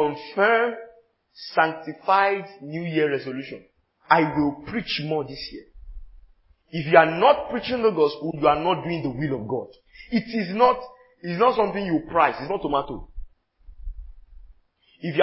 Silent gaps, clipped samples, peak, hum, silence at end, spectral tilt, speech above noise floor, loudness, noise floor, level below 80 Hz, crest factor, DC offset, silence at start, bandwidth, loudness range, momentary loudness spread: none; under 0.1%; 0 dBFS; none; 0 s; -10 dB/octave; 38 dB; -23 LUFS; -60 dBFS; -48 dBFS; 24 dB; under 0.1%; 0 s; 5.8 kHz; 5 LU; 18 LU